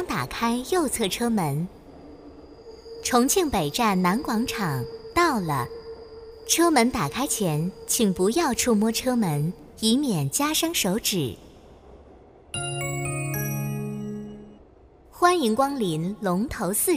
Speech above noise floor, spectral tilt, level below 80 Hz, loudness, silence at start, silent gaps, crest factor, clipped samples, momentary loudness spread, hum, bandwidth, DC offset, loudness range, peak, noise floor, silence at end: 29 dB; -4 dB/octave; -50 dBFS; -24 LUFS; 0 s; none; 20 dB; under 0.1%; 13 LU; none; 16 kHz; under 0.1%; 6 LU; -6 dBFS; -52 dBFS; 0 s